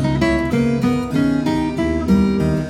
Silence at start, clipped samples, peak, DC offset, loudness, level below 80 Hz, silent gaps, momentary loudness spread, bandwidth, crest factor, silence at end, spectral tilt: 0 s; under 0.1%; -4 dBFS; under 0.1%; -18 LUFS; -32 dBFS; none; 4 LU; 14.5 kHz; 14 dB; 0 s; -7.5 dB/octave